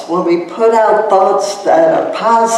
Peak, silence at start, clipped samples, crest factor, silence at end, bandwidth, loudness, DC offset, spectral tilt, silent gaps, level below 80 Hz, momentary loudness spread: 0 dBFS; 0 s; under 0.1%; 10 dB; 0 s; 13 kHz; -11 LUFS; under 0.1%; -4.5 dB/octave; none; -60 dBFS; 4 LU